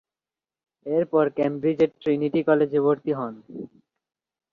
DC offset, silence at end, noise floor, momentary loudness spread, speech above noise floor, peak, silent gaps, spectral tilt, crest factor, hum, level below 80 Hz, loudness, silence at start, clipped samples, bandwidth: under 0.1%; 0.85 s; under -90 dBFS; 19 LU; over 67 dB; -8 dBFS; none; -9 dB/octave; 18 dB; none; -68 dBFS; -23 LUFS; 0.85 s; under 0.1%; 4.8 kHz